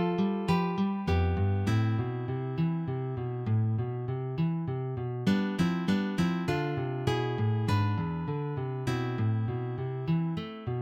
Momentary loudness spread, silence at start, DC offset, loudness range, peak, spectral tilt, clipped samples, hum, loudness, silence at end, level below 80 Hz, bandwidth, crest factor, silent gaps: 6 LU; 0 s; under 0.1%; 2 LU; -12 dBFS; -8 dB/octave; under 0.1%; none; -30 LUFS; 0 s; -50 dBFS; 11 kHz; 16 dB; none